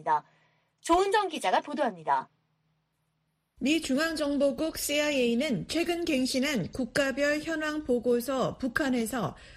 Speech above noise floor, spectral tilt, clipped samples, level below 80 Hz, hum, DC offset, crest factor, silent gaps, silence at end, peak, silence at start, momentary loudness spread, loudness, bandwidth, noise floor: 48 dB; -4 dB/octave; under 0.1%; -56 dBFS; none; under 0.1%; 18 dB; none; 0 s; -12 dBFS; 0 s; 5 LU; -28 LUFS; 15.5 kHz; -77 dBFS